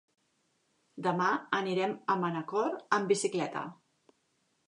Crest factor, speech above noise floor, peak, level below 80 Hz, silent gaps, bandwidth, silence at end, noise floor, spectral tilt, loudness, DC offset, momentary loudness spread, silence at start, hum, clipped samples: 22 dB; 44 dB; -12 dBFS; -84 dBFS; none; 11.5 kHz; 0.95 s; -76 dBFS; -4.5 dB/octave; -31 LUFS; under 0.1%; 7 LU; 0.95 s; none; under 0.1%